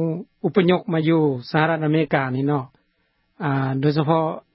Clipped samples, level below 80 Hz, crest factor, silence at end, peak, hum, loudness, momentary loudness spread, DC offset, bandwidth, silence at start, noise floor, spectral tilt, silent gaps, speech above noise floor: under 0.1%; -62 dBFS; 18 dB; 0.15 s; -4 dBFS; none; -21 LUFS; 8 LU; under 0.1%; 5.8 kHz; 0 s; -68 dBFS; -12 dB/octave; none; 47 dB